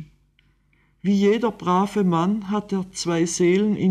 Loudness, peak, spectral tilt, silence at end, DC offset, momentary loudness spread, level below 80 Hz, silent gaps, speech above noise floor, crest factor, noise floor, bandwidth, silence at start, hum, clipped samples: -21 LUFS; -8 dBFS; -6 dB/octave; 0 s; under 0.1%; 6 LU; -58 dBFS; none; 42 dB; 12 dB; -62 dBFS; 12 kHz; 0 s; none; under 0.1%